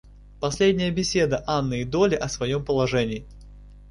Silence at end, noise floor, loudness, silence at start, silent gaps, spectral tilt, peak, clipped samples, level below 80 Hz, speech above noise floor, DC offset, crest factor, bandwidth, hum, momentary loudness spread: 0 s; -45 dBFS; -24 LUFS; 0.05 s; none; -5 dB/octave; -8 dBFS; under 0.1%; -44 dBFS; 22 dB; under 0.1%; 16 dB; 11.5 kHz; 50 Hz at -40 dBFS; 8 LU